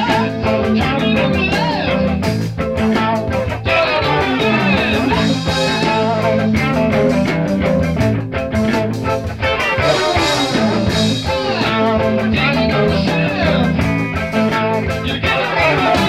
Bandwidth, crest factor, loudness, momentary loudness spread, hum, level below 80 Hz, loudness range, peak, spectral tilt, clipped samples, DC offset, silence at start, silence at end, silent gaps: 14.5 kHz; 12 dB; -15 LUFS; 4 LU; none; -32 dBFS; 1 LU; -2 dBFS; -6 dB/octave; under 0.1%; 0.3%; 0 s; 0 s; none